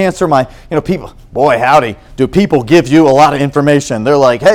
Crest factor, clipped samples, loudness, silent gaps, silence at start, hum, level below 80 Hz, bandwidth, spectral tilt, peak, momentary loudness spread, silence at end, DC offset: 10 dB; 1%; -10 LUFS; none; 0 s; none; -36 dBFS; 16 kHz; -6 dB/octave; 0 dBFS; 10 LU; 0 s; under 0.1%